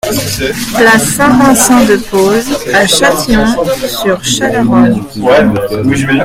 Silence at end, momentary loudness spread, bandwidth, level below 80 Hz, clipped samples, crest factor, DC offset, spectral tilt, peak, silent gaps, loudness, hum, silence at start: 0 s; 7 LU; 18 kHz; -30 dBFS; 0.6%; 8 dB; under 0.1%; -4 dB/octave; 0 dBFS; none; -9 LUFS; none; 0.05 s